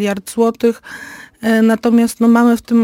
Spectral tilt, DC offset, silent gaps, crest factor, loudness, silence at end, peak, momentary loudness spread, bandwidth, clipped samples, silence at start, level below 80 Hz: -5.5 dB/octave; under 0.1%; none; 12 dB; -14 LUFS; 0 s; -2 dBFS; 18 LU; 16 kHz; under 0.1%; 0 s; -54 dBFS